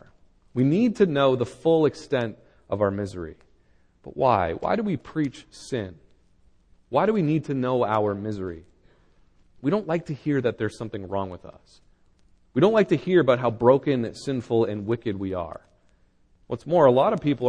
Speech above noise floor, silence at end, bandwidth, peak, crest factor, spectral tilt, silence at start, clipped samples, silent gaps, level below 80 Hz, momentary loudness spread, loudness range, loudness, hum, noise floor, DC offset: 37 dB; 0 s; 10 kHz; -4 dBFS; 20 dB; -7.5 dB/octave; 0.55 s; under 0.1%; none; -56 dBFS; 15 LU; 6 LU; -24 LUFS; none; -60 dBFS; under 0.1%